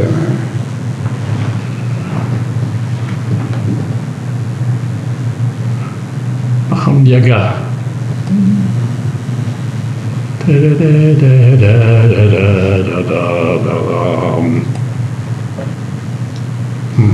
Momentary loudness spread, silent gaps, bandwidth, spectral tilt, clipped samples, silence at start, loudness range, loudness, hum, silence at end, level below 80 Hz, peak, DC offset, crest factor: 12 LU; none; 10.5 kHz; -8.5 dB/octave; under 0.1%; 0 s; 8 LU; -13 LUFS; none; 0 s; -46 dBFS; 0 dBFS; under 0.1%; 12 dB